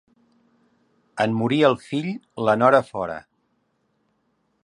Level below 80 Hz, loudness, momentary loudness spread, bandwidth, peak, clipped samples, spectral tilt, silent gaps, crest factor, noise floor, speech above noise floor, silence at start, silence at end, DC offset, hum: -64 dBFS; -21 LUFS; 14 LU; 11 kHz; -2 dBFS; under 0.1%; -6.5 dB/octave; none; 22 dB; -69 dBFS; 49 dB; 1.15 s; 1.45 s; under 0.1%; none